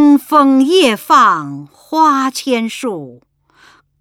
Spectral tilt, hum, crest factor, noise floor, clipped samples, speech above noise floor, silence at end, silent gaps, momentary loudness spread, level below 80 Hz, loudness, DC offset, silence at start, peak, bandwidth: -4 dB/octave; none; 12 dB; -48 dBFS; under 0.1%; 36 dB; 0.9 s; none; 14 LU; -62 dBFS; -12 LUFS; under 0.1%; 0 s; 0 dBFS; 16.5 kHz